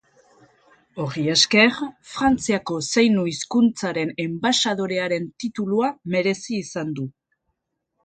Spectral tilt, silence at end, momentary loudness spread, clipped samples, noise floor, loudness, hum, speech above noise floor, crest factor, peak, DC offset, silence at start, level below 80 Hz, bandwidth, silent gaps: -4 dB/octave; 0.95 s; 13 LU; under 0.1%; -77 dBFS; -21 LUFS; none; 55 dB; 20 dB; -2 dBFS; under 0.1%; 0.95 s; -56 dBFS; 9.4 kHz; none